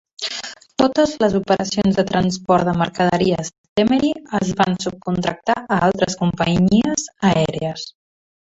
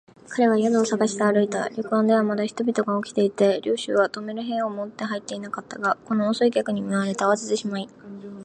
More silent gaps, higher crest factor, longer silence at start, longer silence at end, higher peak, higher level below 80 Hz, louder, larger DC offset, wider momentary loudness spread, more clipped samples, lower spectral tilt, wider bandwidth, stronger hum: first, 3.58-3.76 s vs none; about the same, 16 dB vs 18 dB; about the same, 0.2 s vs 0.3 s; first, 0.6 s vs 0 s; first, -2 dBFS vs -6 dBFS; first, -46 dBFS vs -70 dBFS; first, -19 LUFS vs -23 LUFS; neither; about the same, 9 LU vs 10 LU; neither; about the same, -5.5 dB/octave vs -5 dB/octave; second, 8 kHz vs 9.6 kHz; neither